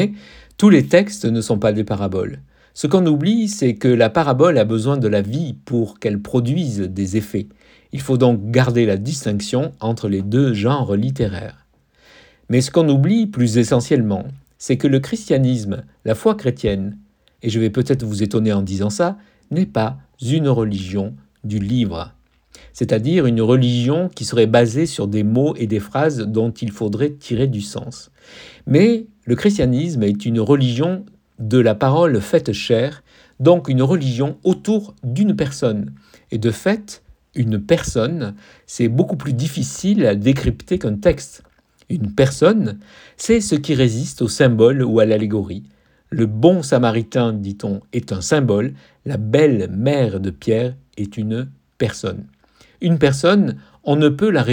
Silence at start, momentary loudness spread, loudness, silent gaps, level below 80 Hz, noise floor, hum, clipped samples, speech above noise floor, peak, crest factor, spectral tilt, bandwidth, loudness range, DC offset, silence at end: 0 s; 12 LU; -18 LUFS; none; -44 dBFS; -55 dBFS; none; under 0.1%; 38 dB; 0 dBFS; 18 dB; -6.5 dB/octave; 18 kHz; 4 LU; under 0.1%; 0 s